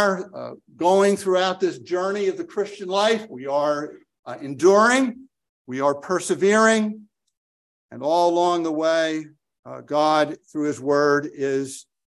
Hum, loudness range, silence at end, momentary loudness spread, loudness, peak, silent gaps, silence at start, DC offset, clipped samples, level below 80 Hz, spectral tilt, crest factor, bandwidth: none; 3 LU; 0.4 s; 17 LU; -21 LUFS; -4 dBFS; 4.19-4.23 s, 5.49-5.65 s, 7.37-7.89 s, 9.59-9.63 s; 0 s; under 0.1%; under 0.1%; -70 dBFS; -4 dB/octave; 18 dB; 12.5 kHz